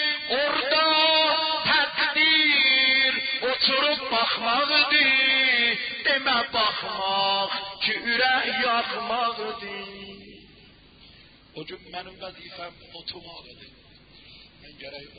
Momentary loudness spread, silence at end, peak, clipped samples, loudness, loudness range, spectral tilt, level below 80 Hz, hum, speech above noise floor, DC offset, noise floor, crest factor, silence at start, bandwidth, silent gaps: 22 LU; 0.1 s; -8 dBFS; under 0.1%; -21 LUFS; 21 LU; -6.5 dB/octave; -62 dBFS; none; 26 dB; under 0.1%; -52 dBFS; 16 dB; 0 s; 5.2 kHz; none